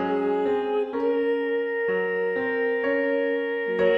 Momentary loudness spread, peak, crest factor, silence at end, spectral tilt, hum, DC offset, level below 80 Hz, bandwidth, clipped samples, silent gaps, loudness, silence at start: 2 LU; -10 dBFS; 14 dB; 0 s; -7 dB/octave; none; under 0.1%; -64 dBFS; 5.4 kHz; under 0.1%; none; -25 LUFS; 0 s